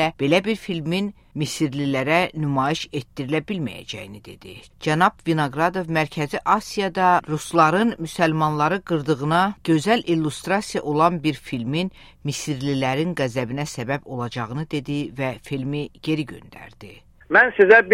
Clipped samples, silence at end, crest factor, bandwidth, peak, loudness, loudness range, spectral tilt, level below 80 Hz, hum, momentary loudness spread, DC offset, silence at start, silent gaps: under 0.1%; 0 s; 20 dB; 16 kHz; -2 dBFS; -22 LUFS; 6 LU; -5.5 dB/octave; -52 dBFS; none; 12 LU; under 0.1%; 0 s; none